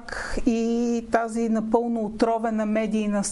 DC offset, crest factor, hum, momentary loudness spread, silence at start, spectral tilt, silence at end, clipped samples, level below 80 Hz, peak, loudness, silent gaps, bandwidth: under 0.1%; 18 dB; none; 2 LU; 0 s; -5.5 dB/octave; 0 s; under 0.1%; -42 dBFS; -6 dBFS; -24 LUFS; none; 11.5 kHz